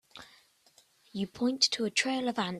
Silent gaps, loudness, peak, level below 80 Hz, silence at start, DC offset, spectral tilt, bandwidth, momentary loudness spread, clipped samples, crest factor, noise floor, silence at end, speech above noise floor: none; -29 LUFS; -10 dBFS; -72 dBFS; 0.15 s; under 0.1%; -2.5 dB/octave; 13.5 kHz; 21 LU; under 0.1%; 24 dB; -65 dBFS; 0 s; 34 dB